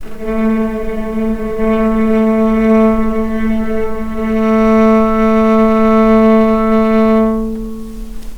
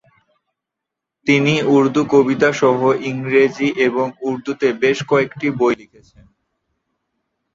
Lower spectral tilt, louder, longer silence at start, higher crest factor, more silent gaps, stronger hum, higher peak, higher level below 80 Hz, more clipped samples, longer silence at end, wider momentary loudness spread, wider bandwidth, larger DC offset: first, -8 dB/octave vs -6 dB/octave; first, -12 LUFS vs -16 LUFS; second, 0 s vs 1.25 s; about the same, 12 dB vs 16 dB; neither; neither; about the same, 0 dBFS vs -2 dBFS; first, -28 dBFS vs -60 dBFS; neither; second, 0 s vs 1.7 s; first, 11 LU vs 7 LU; second, 6.4 kHz vs 7.6 kHz; neither